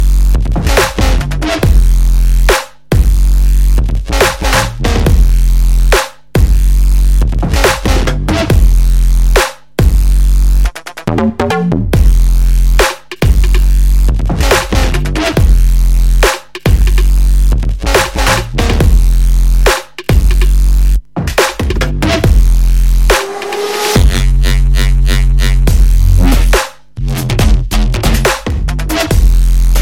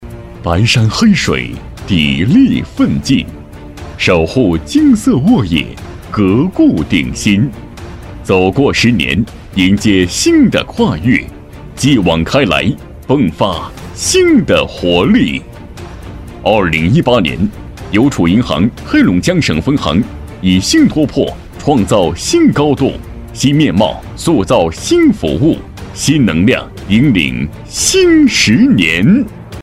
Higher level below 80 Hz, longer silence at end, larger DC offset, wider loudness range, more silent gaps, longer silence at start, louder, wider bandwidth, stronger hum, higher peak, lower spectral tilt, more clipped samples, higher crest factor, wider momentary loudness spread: first, -10 dBFS vs -30 dBFS; about the same, 0 s vs 0 s; first, 2% vs under 0.1%; about the same, 1 LU vs 2 LU; neither; about the same, 0 s vs 0 s; about the same, -12 LUFS vs -11 LUFS; about the same, 16.5 kHz vs 15 kHz; neither; about the same, 0 dBFS vs 0 dBFS; about the same, -5 dB/octave vs -5 dB/octave; first, 0.3% vs under 0.1%; about the same, 8 dB vs 12 dB; second, 4 LU vs 15 LU